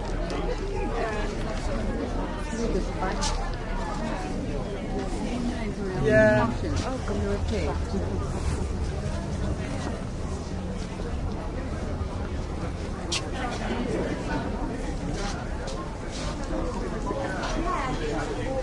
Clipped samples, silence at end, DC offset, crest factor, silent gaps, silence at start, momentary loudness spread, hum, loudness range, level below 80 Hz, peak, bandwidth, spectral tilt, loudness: under 0.1%; 0 s; under 0.1%; 20 dB; none; 0 s; 5 LU; none; 6 LU; -34 dBFS; -8 dBFS; 11.5 kHz; -5.5 dB/octave; -29 LUFS